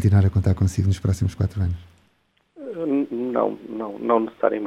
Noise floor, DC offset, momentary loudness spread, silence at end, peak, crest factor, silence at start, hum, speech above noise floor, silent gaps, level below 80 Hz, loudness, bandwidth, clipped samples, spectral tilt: -65 dBFS; under 0.1%; 12 LU; 0 s; -4 dBFS; 18 dB; 0 s; none; 45 dB; none; -42 dBFS; -23 LUFS; 11 kHz; under 0.1%; -8.5 dB/octave